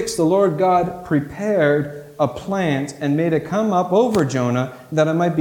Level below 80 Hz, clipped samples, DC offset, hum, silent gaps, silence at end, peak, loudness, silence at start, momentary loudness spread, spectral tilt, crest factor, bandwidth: -52 dBFS; under 0.1%; under 0.1%; none; none; 0 s; -4 dBFS; -19 LUFS; 0 s; 6 LU; -6.5 dB/octave; 14 dB; 18 kHz